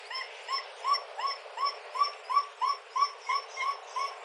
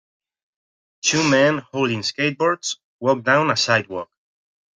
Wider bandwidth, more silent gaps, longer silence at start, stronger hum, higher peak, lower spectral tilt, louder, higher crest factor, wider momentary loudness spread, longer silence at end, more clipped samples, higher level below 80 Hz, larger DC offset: first, 12 kHz vs 9.6 kHz; second, none vs 2.83-2.99 s; second, 0 s vs 1.05 s; neither; second, -14 dBFS vs -2 dBFS; second, 5 dB/octave vs -3.5 dB/octave; second, -32 LUFS vs -19 LUFS; about the same, 18 dB vs 18 dB; second, 6 LU vs 11 LU; second, 0 s vs 0.7 s; neither; second, under -90 dBFS vs -64 dBFS; neither